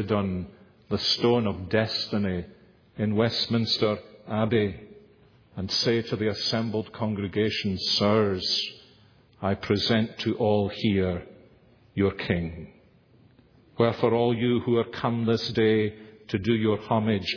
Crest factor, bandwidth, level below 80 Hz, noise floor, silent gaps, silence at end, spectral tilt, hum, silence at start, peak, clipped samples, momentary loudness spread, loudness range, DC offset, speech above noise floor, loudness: 20 dB; 5.4 kHz; -56 dBFS; -58 dBFS; none; 0 s; -6 dB/octave; none; 0 s; -8 dBFS; under 0.1%; 10 LU; 3 LU; under 0.1%; 33 dB; -26 LUFS